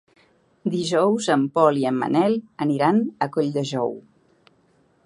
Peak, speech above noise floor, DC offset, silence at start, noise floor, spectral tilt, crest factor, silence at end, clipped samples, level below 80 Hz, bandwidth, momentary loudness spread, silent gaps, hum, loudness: -2 dBFS; 40 dB; under 0.1%; 0.65 s; -61 dBFS; -6 dB/octave; 20 dB; 1.05 s; under 0.1%; -72 dBFS; 11.5 kHz; 8 LU; none; none; -22 LUFS